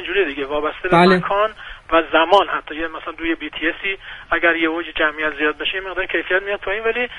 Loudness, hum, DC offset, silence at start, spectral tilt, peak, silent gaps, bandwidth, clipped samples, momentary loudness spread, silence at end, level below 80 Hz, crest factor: -19 LUFS; none; under 0.1%; 0 s; -6 dB/octave; 0 dBFS; none; 10.5 kHz; under 0.1%; 10 LU; 0 s; -44 dBFS; 18 dB